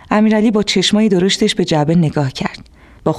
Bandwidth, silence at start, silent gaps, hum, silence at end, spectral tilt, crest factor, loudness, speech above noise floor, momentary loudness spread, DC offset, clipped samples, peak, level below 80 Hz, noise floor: 12 kHz; 0.1 s; none; none; 0 s; -5.5 dB/octave; 12 dB; -14 LUFS; 27 dB; 9 LU; under 0.1%; under 0.1%; -2 dBFS; -44 dBFS; -40 dBFS